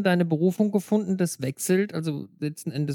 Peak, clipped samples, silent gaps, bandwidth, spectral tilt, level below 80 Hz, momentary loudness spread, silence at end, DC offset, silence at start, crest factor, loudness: -10 dBFS; under 0.1%; none; 18.5 kHz; -6 dB/octave; -72 dBFS; 9 LU; 0 s; under 0.1%; 0 s; 14 dB; -26 LUFS